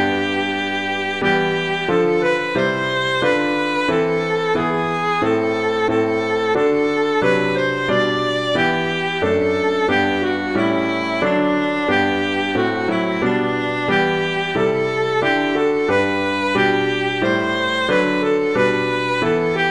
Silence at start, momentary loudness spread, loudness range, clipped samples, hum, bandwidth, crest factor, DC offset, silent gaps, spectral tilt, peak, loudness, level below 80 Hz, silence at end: 0 s; 3 LU; 1 LU; under 0.1%; none; 11 kHz; 14 dB; 0.4%; none; -5.5 dB/octave; -4 dBFS; -18 LUFS; -52 dBFS; 0 s